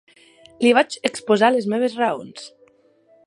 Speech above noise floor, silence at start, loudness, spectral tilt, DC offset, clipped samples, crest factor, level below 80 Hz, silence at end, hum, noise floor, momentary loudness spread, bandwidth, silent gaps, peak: 37 dB; 0.6 s; -19 LUFS; -4 dB/octave; under 0.1%; under 0.1%; 20 dB; -70 dBFS; 0.8 s; none; -56 dBFS; 20 LU; 11.5 kHz; none; -2 dBFS